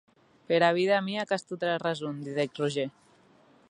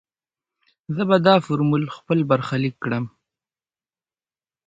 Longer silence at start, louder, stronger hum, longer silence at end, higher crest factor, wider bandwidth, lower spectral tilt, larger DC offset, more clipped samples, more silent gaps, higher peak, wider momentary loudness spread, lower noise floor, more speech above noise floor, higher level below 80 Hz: second, 0.5 s vs 0.9 s; second, -29 LUFS vs -21 LUFS; neither; second, 0.8 s vs 1.6 s; about the same, 22 dB vs 22 dB; first, 11 kHz vs 7.8 kHz; second, -5.5 dB/octave vs -8 dB/octave; neither; neither; neither; second, -8 dBFS vs -2 dBFS; about the same, 10 LU vs 11 LU; second, -60 dBFS vs under -90 dBFS; second, 32 dB vs over 70 dB; second, -78 dBFS vs -60 dBFS